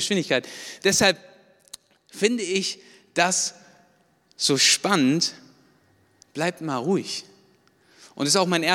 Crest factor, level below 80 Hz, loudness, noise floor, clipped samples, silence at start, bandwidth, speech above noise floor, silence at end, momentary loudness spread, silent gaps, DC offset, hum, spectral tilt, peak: 22 dB; -66 dBFS; -22 LUFS; -62 dBFS; under 0.1%; 0 s; 17.5 kHz; 39 dB; 0 s; 14 LU; none; under 0.1%; none; -2.5 dB/octave; -2 dBFS